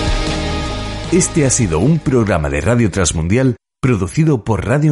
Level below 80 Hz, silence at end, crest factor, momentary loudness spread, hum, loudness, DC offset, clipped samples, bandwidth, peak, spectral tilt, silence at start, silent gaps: -26 dBFS; 0 s; 14 dB; 6 LU; none; -15 LUFS; under 0.1%; under 0.1%; 11.5 kHz; -2 dBFS; -5.5 dB/octave; 0 s; none